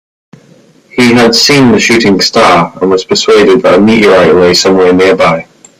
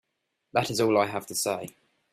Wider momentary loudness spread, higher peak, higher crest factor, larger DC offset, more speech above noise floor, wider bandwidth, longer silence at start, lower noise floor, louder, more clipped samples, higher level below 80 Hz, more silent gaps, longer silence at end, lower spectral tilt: second, 5 LU vs 9 LU; first, 0 dBFS vs -10 dBFS; second, 6 dB vs 20 dB; neither; second, 36 dB vs 53 dB; about the same, 16 kHz vs 16 kHz; first, 0.95 s vs 0.55 s; second, -41 dBFS vs -79 dBFS; first, -5 LUFS vs -27 LUFS; first, 0.5% vs under 0.1%; first, -42 dBFS vs -66 dBFS; neither; about the same, 0.4 s vs 0.45 s; about the same, -4 dB/octave vs -4 dB/octave